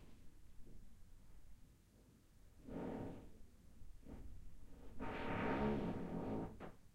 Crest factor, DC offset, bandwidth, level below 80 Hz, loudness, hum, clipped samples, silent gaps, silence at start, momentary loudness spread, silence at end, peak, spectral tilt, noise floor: 18 dB; under 0.1%; 16 kHz; -58 dBFS; -46 LUFS; none; under 0.1%; none; 0 s; 26 LU; 0 s; -28 dBFS; -7.5 dB/octave; -68 dBFS